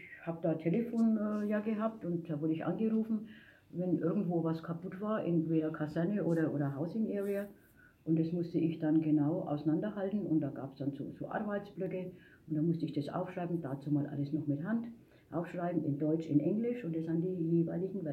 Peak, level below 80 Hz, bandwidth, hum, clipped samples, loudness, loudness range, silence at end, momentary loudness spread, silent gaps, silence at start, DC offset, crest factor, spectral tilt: -18 dBFS; -74 dBFS; 12 kHz; none; under 0.1%; -35 LUFS; 3 LU; 0 s; 8 LU; none; 0 s; under 0.1%; 18 dB; -10 dB/octave